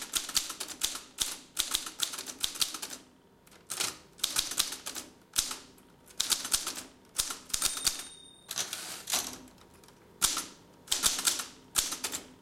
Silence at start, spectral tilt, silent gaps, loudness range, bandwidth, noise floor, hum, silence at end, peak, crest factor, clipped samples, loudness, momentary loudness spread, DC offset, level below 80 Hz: 0 s; 1 dB/octave; none; 2 LU; 17 kHz; -60 dBFS; none; 0 s; -8 dBFS; 28 dB; under 0.1%; -32 LUFS; 12 LU; under 0.1%; -60 dBFS